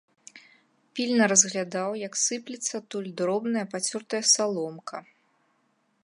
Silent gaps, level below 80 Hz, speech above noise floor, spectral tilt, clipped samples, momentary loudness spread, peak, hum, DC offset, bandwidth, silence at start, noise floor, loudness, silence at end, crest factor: none; -80 dBFS; 43 dB; -2 dB/octave; under 0.1%; 15 LU; -6 dBFS; none; under 0.1%; 11.5 kHz; 0.35 s; -70 dBFS; -25 LUFS; 1 s; 22 dB